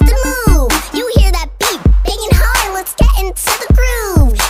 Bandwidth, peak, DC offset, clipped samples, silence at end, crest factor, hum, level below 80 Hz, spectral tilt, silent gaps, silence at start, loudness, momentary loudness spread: 16.5 kHz; 0 dBFS; under 0.1%; 0.4%; 0 s; 10 dB; none; -12 dBFS; -4.5 dB/octave; none; 0 s; -13 LUFS; 4 LU